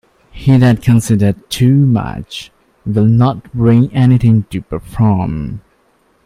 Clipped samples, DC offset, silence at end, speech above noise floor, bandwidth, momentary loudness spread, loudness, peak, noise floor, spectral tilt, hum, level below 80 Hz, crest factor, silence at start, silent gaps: under 0.1%; under 0.1%; 0.65 s; 44 dB; 14.5 kHz; 15 LU; -12 LUFS; 0 dBFS; -55 dBFS; -7.5 dB/octave; none; -36 dBFS; 12 dB; 0.35 s; none